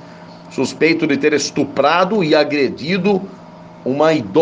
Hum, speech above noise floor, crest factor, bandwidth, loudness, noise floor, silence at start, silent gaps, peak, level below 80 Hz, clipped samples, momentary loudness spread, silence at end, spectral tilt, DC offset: none; 22 dB; 16 dB; 9.6 kHz; -16 LUFS; -37 dBFS; 0 s; none; 0 dBFS; -60 dBFS; under 0.1%; 9 LU; 0 s; -5 dB/octave; under 0.1%